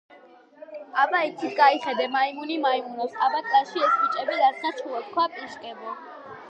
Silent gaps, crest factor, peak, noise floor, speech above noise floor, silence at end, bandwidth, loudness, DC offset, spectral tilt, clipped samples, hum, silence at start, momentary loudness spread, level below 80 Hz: none; 20 dB; -6 dBFS; -51 dBFS; 27 dB; 0 s; 8.4 kHz; -24 LUFS; under 0.1%; -3.5 dB/octave; under 0.1%; none; 0.15 s; 17 LU; -82 dBFS